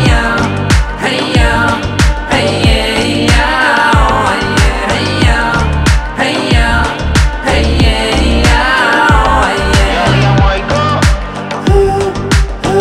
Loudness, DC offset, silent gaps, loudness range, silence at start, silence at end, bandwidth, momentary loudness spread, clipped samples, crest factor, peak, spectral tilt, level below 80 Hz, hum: -10 LUFS; under 0.1%; none; 2 LU; 0 s; 0 s; 13.5 kHz; 4 LU; under 0.1%; 10 dB; 0 dBFS; -5 dB/octave; -16 dBFS; none